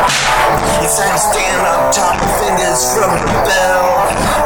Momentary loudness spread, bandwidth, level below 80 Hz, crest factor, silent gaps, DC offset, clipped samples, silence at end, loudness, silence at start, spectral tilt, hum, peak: 2 LU; over 20 kHz; -28 dBFS; 12 dB; none; 0.4%; under 0.1%; 0 s; -12 LUFS; 0 s; -2.5 dB/octave; none; -2 dBFS